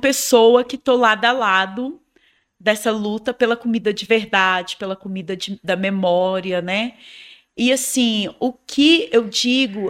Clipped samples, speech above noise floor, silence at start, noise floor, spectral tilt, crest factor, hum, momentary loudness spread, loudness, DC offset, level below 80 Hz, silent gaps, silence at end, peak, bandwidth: under 0.1%; 42 dB; 0 s; -60 dBFS; -3 dB/octave; 18 dB; none; 13 LU; -18 LUFS; under 0.1%; -60 dBFS; none; 0 s; -2 dBFS; 16 kHz